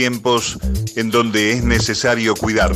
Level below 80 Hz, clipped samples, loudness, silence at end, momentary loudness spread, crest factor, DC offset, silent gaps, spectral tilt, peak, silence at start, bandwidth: -26 dBFS; under 0.1%; -17 LUFS; 0 s; 6 LU; 16 dB; under 0.1%; none; -4 dB/octave; -2 dBFS; 0 s; 16 kHz